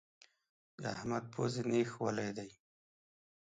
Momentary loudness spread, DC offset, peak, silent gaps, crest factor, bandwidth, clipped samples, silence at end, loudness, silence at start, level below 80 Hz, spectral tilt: 11 LU; under 0.1%; -22 dBFS; none; 18 dB; 9.4 kHz; under 0.1%; 0.85 s; -38 LUFS; 0.8 s; -74 dBFS; -6 dB/octave